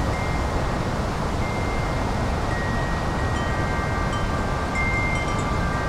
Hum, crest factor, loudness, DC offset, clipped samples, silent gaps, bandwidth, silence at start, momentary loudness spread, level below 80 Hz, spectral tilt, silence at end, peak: none; 14 dB; -25 LUFS; under 0.1%; under 0.1%; none; 15 kHz; 0 s; 3 LU; -30 dBFS; -6 dB/octave; 0 s; -10 dBFS